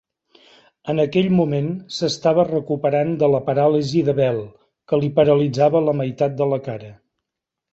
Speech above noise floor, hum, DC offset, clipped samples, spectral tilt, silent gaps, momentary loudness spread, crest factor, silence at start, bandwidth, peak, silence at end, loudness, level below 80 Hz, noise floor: 65 dB; none; under 0.1%; under 0.1%; -7 dB/octave; none; 9 LU; 16 dB; 0.85 s; 8 kHz; -2 dBFS; 0.8 s; -19 LUFS; -56 dBFS; -83 dBFS